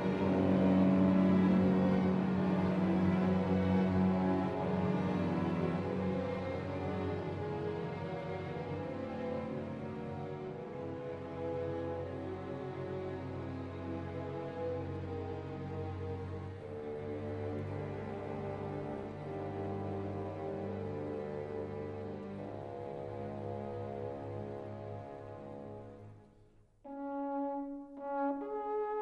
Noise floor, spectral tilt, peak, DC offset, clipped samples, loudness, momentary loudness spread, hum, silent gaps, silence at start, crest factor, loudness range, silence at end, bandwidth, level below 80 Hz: -63 dBFS; -9.5 dB/octave; -18 dBFS; under 0.1%; under 0.1%; -36 LUFS; 14 LU; none; none; 0 s; 16 dB; 12 LU; 0 s; 6.2 kHz; -62 dBFS